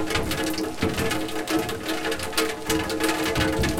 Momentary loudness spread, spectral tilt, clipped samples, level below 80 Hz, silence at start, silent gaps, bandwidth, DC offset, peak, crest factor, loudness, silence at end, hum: 4 LU; -4 dB/octave; under 0.1%; -40 dBFS; 0 s; none; 17 kHz; under 0.1%; -8 dBFS; 18 dB; -25 LUFS; 0 s; none